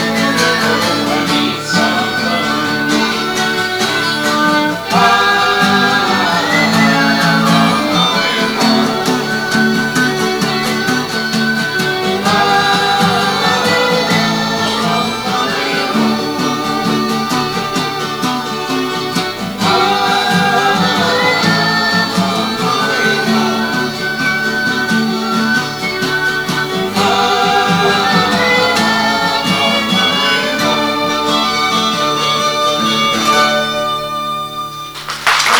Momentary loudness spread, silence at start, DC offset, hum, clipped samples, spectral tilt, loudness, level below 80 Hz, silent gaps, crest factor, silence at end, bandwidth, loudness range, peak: 6 LU; 0 s; under 0.1%; none; under 0.1%; -3.5 dB/octave; -13 LUFS; -48 dBFS; none; 14 dB; 0 s; over 20 kHz; 4 LU; 0 dBFS